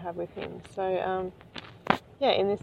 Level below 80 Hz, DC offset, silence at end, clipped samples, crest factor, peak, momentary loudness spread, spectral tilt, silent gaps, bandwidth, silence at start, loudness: -62 dBFS; under 0.1%; 0.05 s; under 0.1%; 26 dB; -4 dBFS; 16 LU; -6 dB/octave; none; 10.5 kHz; 0 s; -30 LUFS